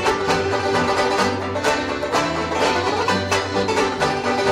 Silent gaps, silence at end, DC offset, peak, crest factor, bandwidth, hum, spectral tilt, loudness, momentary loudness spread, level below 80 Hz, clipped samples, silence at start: none; 0 s; under 0.1%; -6 dBFS; 14 dB; 16 kHz; none; -4 dB/octave; -20 LUFS; 2 LU; -46 dBFS; under 0.1%; 0 s